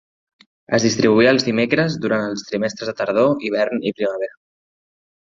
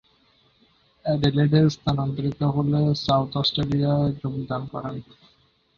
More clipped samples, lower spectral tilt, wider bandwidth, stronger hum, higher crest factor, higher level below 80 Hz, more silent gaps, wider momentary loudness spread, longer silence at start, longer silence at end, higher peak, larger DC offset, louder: neither; second, -5 dB/octave vs -7.5 dB/octave; about the same, 7.6 kHz vs 7 kHz; neither; about the same, 18 dB vs 18 dB; second, -58 dBFS vs -48 dBFS; neither; about the same, 10 LU vs 12 LU; second, 0.7 s vs 1.05 s; first, 0.95 s vs 0.75 s; first, -2 dBFS vs -6 dBFS; neither; first, -19 LUFS vs -23 LUFS